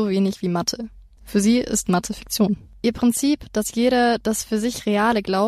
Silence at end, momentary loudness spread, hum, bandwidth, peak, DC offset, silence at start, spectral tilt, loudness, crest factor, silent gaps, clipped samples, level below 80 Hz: 0 s; 6 LU; none; 15 kHz; -6 dBFS; under 0.1%; 0 s; -4.5 dB/octave; -21 LUFS; 14 dB; none; under 0.1%; -46 dBFS